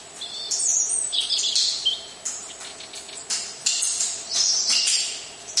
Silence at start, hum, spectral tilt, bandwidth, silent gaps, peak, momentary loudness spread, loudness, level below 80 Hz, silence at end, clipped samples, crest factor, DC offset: 0 s; none; 3 dB/octave; 11.5 kHz; none; -4 dBFS; 16 LU; -21 LUFS; -70 dBFS; 0 s; under 0.1%; 20 dB; under 0.1%